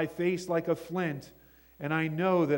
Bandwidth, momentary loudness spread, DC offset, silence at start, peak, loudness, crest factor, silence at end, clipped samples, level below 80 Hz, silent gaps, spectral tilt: 16.5 kHz; 9 LU; under 0.1%; 0 s; -14 dBFS; -31 LUFS; 16 dB; 0 s; under 0.1%; -66 dBFS; none; -7 dB/octave